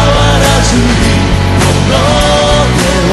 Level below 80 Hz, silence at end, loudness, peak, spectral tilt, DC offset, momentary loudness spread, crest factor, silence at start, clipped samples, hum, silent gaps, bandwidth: -16 dBFS; 0 s; -8 LUFS; 0 dBFS; -4.5 dB/octave; under 0.1%; 2 LU; 8 dB; 0 s; 0.3%; none; none; 12.5 kHz